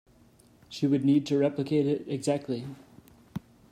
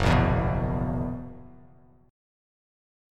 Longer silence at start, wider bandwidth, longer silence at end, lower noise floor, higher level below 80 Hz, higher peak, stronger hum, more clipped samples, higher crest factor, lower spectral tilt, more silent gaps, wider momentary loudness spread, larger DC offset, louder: first, 0.7 s vs 0 s; about the same, 11 kHz vs 11 kHz; second, 0.35 s vs 1.6 s; first, -59 dBFS vs -55 dBFS; second, -66 dBFS vs -36 dBFS; second, -14 dBFS vs -8 dBFS; neither; neither; about the same, 16 dB vs 20 dB; about the same, -7 dB/octave vs -7.5 dB/octave; neither; about the same, 18 LU vs 20 LU; neither; about the same, -28 LUFS vs -27 LUFS